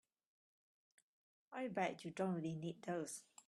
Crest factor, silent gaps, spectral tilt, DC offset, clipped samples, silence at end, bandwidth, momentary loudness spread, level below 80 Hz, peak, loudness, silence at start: 20 dB; none; -5.5 dB/octave; under 0.1%; under 0.1%; 0.05 s; 13 kHz; 7 LU; -86 dBFS; -26 dBFS; -45 LUFS; 1.5 s